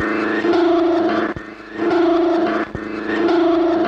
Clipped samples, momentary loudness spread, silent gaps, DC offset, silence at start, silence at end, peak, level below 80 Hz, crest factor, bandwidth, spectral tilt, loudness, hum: under 0.1%; 10 LU; none; under 0.1%; 0 s; 0 s; -8 dBFS; -50 dBFS; 10 dB; 6.8 kHz; -6.5 dB/octave; -18 LUFS; none